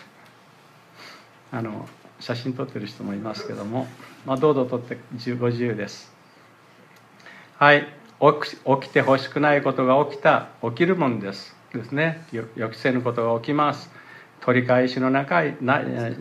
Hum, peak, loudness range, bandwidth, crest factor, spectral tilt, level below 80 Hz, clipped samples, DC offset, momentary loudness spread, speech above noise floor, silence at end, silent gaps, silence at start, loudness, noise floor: none; -2 dBFS; 11 LU; 13 kHz; 22 dB; -7 dB/octave; -70 dBFS; under 0.1%; under 0.1%; 16 LU; 30 dB; 0 s; none; 0 s; -22 LUFS; -52 dBFS